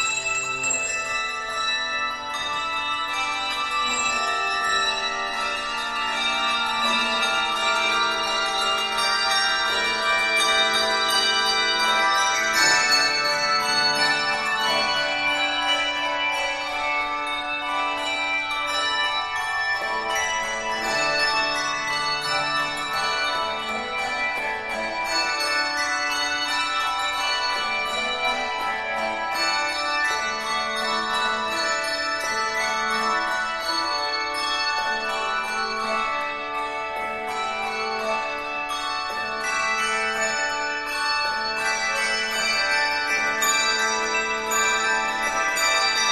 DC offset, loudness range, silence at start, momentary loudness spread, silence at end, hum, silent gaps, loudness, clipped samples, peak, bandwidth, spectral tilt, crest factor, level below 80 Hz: under 0.1%; 5 LU; 0 s; 7 LU; 0 s; none; none; -22 LUFS; under 0.1%; -6 dBFS; 13.5 kHz; 0 dB/octave; 18 dB; -54 dBFS